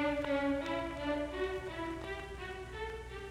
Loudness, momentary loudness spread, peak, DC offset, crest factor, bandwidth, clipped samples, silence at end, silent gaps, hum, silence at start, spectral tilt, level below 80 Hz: -38 LUFS; 10 LU; -22 dBFS; under 0.1%; 16 dB; 14.5 kHz; under 0.1%; 0 s; none; none; 0 s; -6 dB/octave; -52 dBFS